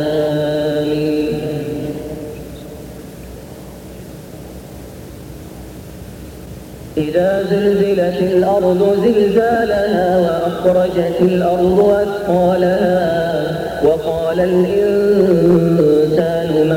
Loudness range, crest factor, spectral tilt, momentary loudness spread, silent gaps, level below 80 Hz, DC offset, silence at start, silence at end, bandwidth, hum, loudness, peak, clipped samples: 19 LU; 12 dB; -7.5 dB/octave; 21 LU; none; -40 dBFS; under 0.1%; 0 s; 0 s; 17 kHz; none; -15 LUFS; -4 dBFS; under 0.1%